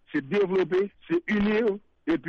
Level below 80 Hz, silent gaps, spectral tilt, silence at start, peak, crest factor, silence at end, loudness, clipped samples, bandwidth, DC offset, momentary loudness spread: -54 dBFS; none; -7.5 dB/octave; 0.15 s; -16 dBFS; 10 dB; 0 s; -26 LUFS; under 0.1%; 6.8 kHz; under 0.1%; 5 LU